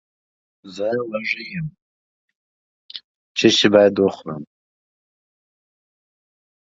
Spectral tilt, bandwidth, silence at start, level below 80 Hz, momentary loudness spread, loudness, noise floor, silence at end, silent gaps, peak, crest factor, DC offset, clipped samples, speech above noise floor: -4.5 dB/octave; 7.8 kHz; 0.65 s; -60 dBFS; 23 LU; -18 LUFS; under -90 dBFS; 2.3 s; 1.82-2.28 s, 2.35-2.89 s, 3.04-3.35 s; 0 dBFS; 22 dB; under 0.1%; under 0.1%; over 72 dB